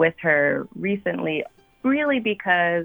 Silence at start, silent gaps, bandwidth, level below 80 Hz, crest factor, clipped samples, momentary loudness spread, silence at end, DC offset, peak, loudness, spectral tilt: 0 s; none; over 20 kHz; -62 dBFS; 16 dB; under 0.1%; 8 LU; 0 s; under 0.1%; -6 dBFS; -22 LUFS; -8 dB/octave